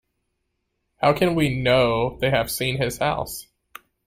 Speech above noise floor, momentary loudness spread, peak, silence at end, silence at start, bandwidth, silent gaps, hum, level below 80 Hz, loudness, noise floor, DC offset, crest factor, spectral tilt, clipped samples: 54 dB; 7 LU; -6 dBFS; 0.65 s; 1 s; 16 kHz; none; none; -46 dBFS; -21 LUFS; -75 dBFS; under 0.1%; 18 dB; -5 dB/octave; under 0.1%